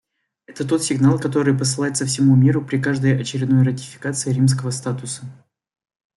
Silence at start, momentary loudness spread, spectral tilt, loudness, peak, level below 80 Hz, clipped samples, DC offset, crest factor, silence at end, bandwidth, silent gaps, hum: 0.5 s; 12 LU; -5.5 dB/octave; -19 LUFS; -4 dBFS; -58 dBFS; under 0.1%; under 0.1%; 16 dB; 0.85 s; 12 kHz; none; none